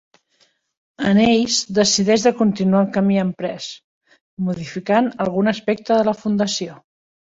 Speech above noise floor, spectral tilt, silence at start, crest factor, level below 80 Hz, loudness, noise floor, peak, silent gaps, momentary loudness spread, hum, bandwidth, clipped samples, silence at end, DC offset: 44 dB; -4.5 dB/octave; 1 s; 18 dB; -56 dBFS; -18 LUFS; -62 dBFS; -2 dBFS; 3.84-4.01 s, 4.21-4.37 s; 12 LU; none; 8 kHz; under 0.1%; 0.65 s; under 0.1%